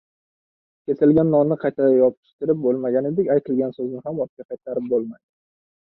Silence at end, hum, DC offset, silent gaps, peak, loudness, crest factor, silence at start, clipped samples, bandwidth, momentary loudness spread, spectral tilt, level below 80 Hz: 0.75 s; none; under 0.1%; 2.17-2.23 s, 2.33-2.39 s, 4.29-4.37 s, 4.45-4.49 s; -6 dBFS; -21 LUFS; 16 dB; 0.9 s; under 0.1%; 4.2 kHz; 12 LU; -13 dB/octave; -60 dBFS